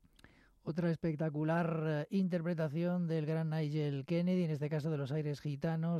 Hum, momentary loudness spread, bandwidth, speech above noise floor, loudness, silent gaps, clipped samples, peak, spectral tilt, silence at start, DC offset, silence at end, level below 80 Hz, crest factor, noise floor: none; 4 LU; 7.2 kHz; 29 dB; -36 LUFS; none; under 0.1%; -24 dBFS; -9 dB/octave; 0.65 s; under 0.1%; 0 s; -72 dBFS; 12 dB; -64 dBFS